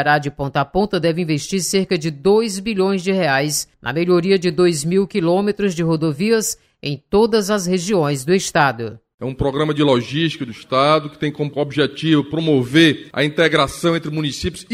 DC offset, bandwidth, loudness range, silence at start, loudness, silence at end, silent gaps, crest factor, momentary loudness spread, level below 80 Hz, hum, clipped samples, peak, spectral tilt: under 0.1%; 16 kHz; 2 LU; 0 s; -18 LUFS; 0 s; 9.14-9.18 s; 18 dB; 8 LU; -46 dBFS; none; under 0.1%; 0 dBFS; -5 dB/octave